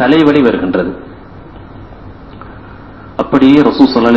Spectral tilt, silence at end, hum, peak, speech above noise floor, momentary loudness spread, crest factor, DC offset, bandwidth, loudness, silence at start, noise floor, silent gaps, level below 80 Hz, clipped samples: -7.5 dB/octave; 0 s; none; 0 dBFS; 24 dB; 26 LU; 12 dB; 0.6%; 6.6 kHz; -10 LUFS; 0 s; -32 dBFS; none; -38 dBFS; 1%